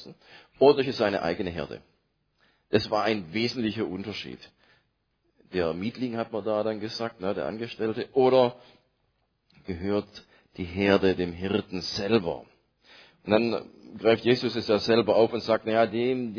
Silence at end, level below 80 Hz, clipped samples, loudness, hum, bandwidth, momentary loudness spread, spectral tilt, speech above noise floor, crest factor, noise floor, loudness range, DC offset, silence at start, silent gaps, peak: 0 s; -60 dBFS; under 0.1%; -26 LUFS; none; 5.4 kHz; 14 LU; -6.5 dB/octave; 47 dB; 22 dB; -73 dBFS; 6 LU; under 0.1%; 0 s; none; -6 dBFS